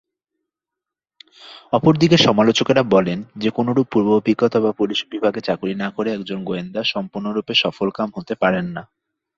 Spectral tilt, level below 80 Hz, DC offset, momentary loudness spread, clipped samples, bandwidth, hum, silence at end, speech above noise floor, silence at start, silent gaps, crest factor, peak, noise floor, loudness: -5.5 dB/octave; -56 dBFS; under 0.1%; 11 LU; under 0.1%; 7.6 kHz; none; 0.55 s; 67 dB; 1.4 s; none; 18 dB; -2 dBFS; -86 dBFS; -19 LUFS